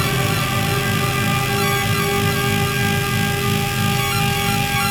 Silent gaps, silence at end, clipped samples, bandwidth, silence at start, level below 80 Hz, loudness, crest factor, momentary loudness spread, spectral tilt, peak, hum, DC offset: none; 0 s; under 0.1%; over 20 kHz; 0 s; -38 dBFS; -18 LUFS; 14 dB; 1 LU; -4 dB/octave; -4 dBFS; none; under 0.1%